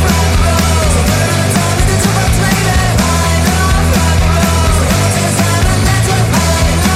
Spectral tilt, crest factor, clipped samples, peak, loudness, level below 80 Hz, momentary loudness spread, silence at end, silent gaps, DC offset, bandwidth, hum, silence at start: -4.5 dB/octave; 10 dB; under 0.1%; 0 dBFS; -11 LUFS; -18 dBFS; 1 LU; 0 s; none; under 0.1%; 16 kHz; none; 0 s